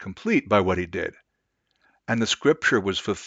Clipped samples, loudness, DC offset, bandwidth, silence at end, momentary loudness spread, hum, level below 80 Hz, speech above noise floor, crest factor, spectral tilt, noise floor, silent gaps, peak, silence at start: under 0.1%; -23 LUFS; under 0.1%; 9.2 kHz; 0 s; 10 LU; none; -56 dBFS; 52 dB; 20 dB; -4.5 dB/octave; -75 dBFS; none; -4 dBFS; 0 s